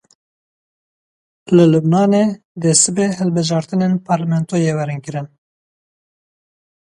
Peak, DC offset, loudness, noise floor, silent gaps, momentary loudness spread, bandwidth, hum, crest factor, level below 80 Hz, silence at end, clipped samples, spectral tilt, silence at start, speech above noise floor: 0 dBFS; under 0.1%; -15 LUFS; under -90 dBFS; 2.45-2.55 s; 11 LU; 11.5 kHz; none; 18 dB; -60 dBFS; 1.6 s; under 0.1%; -5.5 dB/octave; 1.5 s; over 75 dB